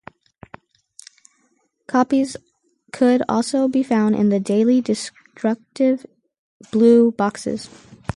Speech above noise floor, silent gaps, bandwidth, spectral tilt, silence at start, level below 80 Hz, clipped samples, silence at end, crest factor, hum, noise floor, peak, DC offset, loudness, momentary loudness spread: 47 dB; 6.39-6.60 s; 11.5 kHz; -6 dB/octave; 1.9 s; -54 dBFS; under 0.1%; 0.5 s; 16 dB; none; -65 dBFS; -4 dBFS; under 0.1%; -19 LUFS; 15 LU